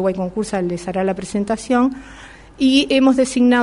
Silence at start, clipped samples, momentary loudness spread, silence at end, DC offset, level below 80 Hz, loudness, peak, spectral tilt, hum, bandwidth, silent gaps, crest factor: 0 s; under 0.1%; 9 LU; 0 s; under 0.1%; -46 dBFS; -18 LUFS; -2 dBFS; -5 dB/octave; none; 11 kHz; none; 16 dB